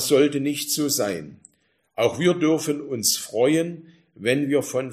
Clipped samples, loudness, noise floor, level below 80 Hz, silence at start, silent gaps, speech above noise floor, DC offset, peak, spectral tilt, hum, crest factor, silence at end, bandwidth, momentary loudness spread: under 0.1%; -22 LUFS; -67 dBFS; -66 dBFS; 0 s; none; 45 dB; under 0.1%; -6 dBFS; -4 dB/octave; none; 16 dB; 0 s; 15.5 kHz; 11 LU